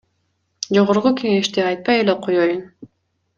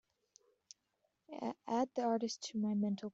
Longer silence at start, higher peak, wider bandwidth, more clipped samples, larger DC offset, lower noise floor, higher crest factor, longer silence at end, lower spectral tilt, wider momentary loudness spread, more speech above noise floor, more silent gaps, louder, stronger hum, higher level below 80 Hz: second, 0.6 s vs 1.3 s; first, -2 dBFS vs -24 dBFS; first, 9.2 kHz vs 8 kHz; neither; neither; second, -69 dBFS vs -83 dBFS; about the same, 18 dB vs 16 dB; first, 0.55 s vs 0.05 s; about the same, -5 dB/octave vs -5.5 dB/octave; second, 5 LU vs 9 LU; first, 52 dB vs 45 dB; neither; first, -18 LUFS vs -38 LUFS; neither; first, -62 dBFS vs -82 dBFS